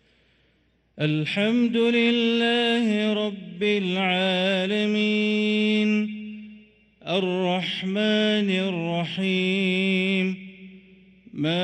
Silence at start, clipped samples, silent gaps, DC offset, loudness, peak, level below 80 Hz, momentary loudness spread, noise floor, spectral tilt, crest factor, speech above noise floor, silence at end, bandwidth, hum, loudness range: 0.95 s; under 0.1%; none; under 0.1%; -23 LUFS; -10 dBFS; -68 dBFS; 8 LU; -65 dBFS; -6 dB/octave; 14 dB; 42 dB; 0 s; 9.2 kHz; none; 3 LU